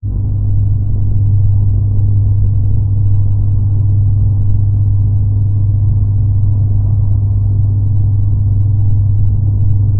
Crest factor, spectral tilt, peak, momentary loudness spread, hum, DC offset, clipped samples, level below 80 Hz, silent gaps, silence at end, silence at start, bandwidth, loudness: 10 dB; -17 dB/octave; 0 dBFS; 2 LU; none; under 0.1%; under 0.1%; -18 dBFS; none; 0 s; 0.05 s; 1.1 kHz; -13 LUFS